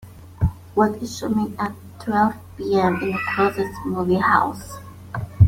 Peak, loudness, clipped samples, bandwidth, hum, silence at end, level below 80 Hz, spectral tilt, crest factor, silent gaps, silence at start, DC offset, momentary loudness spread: -2 dBFS; -22 LUFS; under 0.1%; 16.5 kHz; none; 0 s; -40 dBFS; -7 dB/octave; 20 dB; none; 0 s; under 0.1%; 14 LU